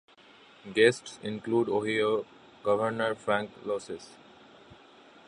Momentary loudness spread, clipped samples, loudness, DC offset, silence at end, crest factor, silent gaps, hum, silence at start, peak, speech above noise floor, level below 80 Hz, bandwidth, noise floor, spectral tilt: 18 LU; under 0.1%; -29 LUFS; under 0.1%; 1.2 s; 24 dB; none; none; 0.65 s; -8 dBFS; 28 dB; -70 dBFS; 11 kHz; -56 dBFS; -5 dB/octave